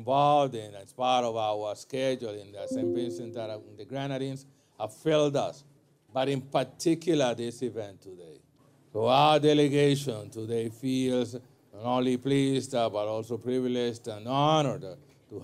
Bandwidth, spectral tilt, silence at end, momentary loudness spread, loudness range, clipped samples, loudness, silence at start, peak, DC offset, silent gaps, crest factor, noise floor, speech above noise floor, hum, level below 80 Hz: 15 kHz; -5.5 dB/octave; 0 s; 16 LU; 6 LU; under 0.1%; -28 LUFS; 0 s; -10 dBFS; under 0.1%; none; 18 dB; -56 dBFS; 28 dB; none; -72 dBFS